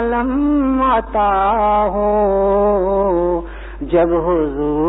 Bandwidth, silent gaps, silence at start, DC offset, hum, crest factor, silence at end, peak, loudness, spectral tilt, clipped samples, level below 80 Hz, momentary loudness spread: 4 kHz; none; 0 s; 0.2%; none; 10 dB; 0 s; -6 dBFS; -16 LUFS; -11.5 dB/octave; under 0.1%; -30 dBFS; 4 LU